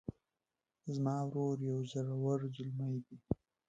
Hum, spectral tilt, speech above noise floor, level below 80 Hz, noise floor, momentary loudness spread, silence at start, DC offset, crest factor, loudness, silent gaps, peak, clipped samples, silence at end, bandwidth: none; -8.5 dB/octave; over 53 dB; -64 dBFS; under -90 dBFS; 7 LU; 0.1 s; under 0.1%; 20 dB; -39 LUFS; none; -20 dBFS; under 0.1%; 0.35 s; 7.8 kHz